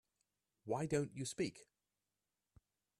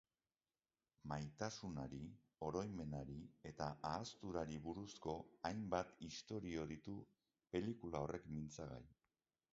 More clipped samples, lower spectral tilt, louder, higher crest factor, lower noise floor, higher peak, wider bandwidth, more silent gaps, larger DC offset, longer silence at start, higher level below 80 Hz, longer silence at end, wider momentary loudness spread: neither; about the same, -5.5 dB/octave vs -5.5 dB/octave; first, -42 LUFS vs -49 LUFS; about the same, 22 dB vs 24 dB; about the same, under -90 dBFS vs under -90 dBFS; about the same, -24 dBFS vs -26 dBFS; first, 13 kHz vs 7.6 kHz; neither; neither; second, 0.65 s vs 1.05 s; second, -76 dBFS vs -68 dBFS; first, 1.35 s vs 0.6 s; second, 5 LU vs 9 LU